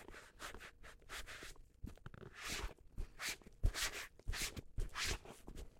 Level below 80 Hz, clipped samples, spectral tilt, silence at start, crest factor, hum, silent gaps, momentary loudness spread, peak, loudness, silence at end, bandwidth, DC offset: -50 dBFS; under 0.1%; -2 dB/octave; 0 s; 24 dB; none; none; 15 LU; -22 dBFS; -46 LUFS; 0 s; 16.5 kHz; under 0.1%